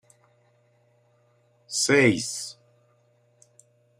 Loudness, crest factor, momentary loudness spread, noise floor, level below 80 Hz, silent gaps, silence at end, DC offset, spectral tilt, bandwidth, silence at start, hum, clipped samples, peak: -23 LUFS; 22 dB; 15 LU; -64 dBFS; -72 dBFS; none; 1.5 s; under 0.1%; -3.5 dB/octave; 15.5 kHz; 1.7 s; 60 Hz at -50 dBFS; under 0.1%; -6 dBFS